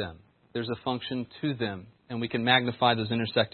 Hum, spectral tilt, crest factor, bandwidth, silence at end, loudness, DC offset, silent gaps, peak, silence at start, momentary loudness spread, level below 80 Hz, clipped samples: none; -9.5 dB/octave; 24 dB; 4.5 kHz; 0.05 s; -28 LUFS; under 0.1%; none; -4 dBFS; 0 s; 15 LU; -66 dBFS; under 0.1%